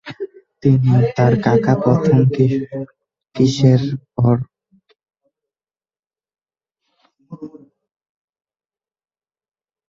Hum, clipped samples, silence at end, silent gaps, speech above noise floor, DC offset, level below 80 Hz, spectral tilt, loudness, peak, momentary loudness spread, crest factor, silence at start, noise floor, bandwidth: none; under 0.1%; 2.4 s; 5.99-6.03 s; over 76 dB; under 0.1%; -50 dBFS; -8 dB/octave; -16 LUFS; -2 dBFS; 21 LU; 18 dB; 0.05 s; under -90 dBFS; 7.4 kHz